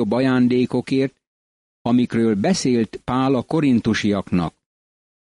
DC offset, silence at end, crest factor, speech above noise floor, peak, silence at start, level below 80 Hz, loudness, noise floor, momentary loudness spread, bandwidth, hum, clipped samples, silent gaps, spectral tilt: under 0.1%; 0.85 s; 12 dB; over 71 dB; -8 dBFS; 0 s; -52 dBFS; -20 LUFS; under -90 dBFS; 6 LU; 11 kHz; none; under 0.1%; 1.27-1.85 s; -6 dB/octave